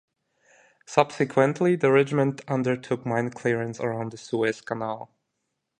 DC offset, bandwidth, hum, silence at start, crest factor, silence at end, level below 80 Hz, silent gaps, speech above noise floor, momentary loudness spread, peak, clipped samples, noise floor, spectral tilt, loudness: under 0.1%; 10 kHz; none; 0.9 s; 22 dB; 0.75 s; -68 dBFS; none; 55 dB; 10 LU; -2 dBFS; under 0.1%; -80 dBFS; -6.5 dB/octave; -25 LUFS